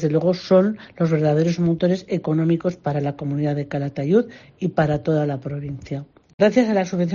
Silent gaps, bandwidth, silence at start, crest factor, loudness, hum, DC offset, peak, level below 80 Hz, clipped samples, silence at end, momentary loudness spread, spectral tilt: 6.34-6.38 s; 7.2 kHz; 0 s; 16 dB; -21 LUFS; none; under 0.1%; -4 dBFS; -54 dBFS; under 0.1%; 0 s; 11 LU; -8 dB/octave